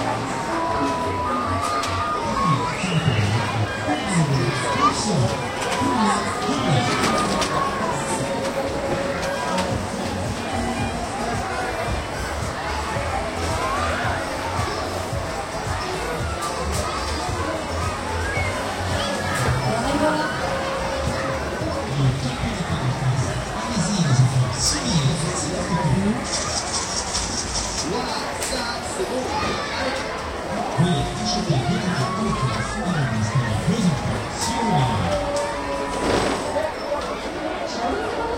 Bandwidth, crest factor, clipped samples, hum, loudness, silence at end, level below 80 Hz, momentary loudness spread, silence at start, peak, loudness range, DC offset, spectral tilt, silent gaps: 16.5 kHz; 18 dB; under 0.1%; none; -23 LUFS; 0 s; -38 dBFS; 6 LU; 0 s; -6 dBFS; 4 LU; under 0.1%; -4.5 dB/octave; none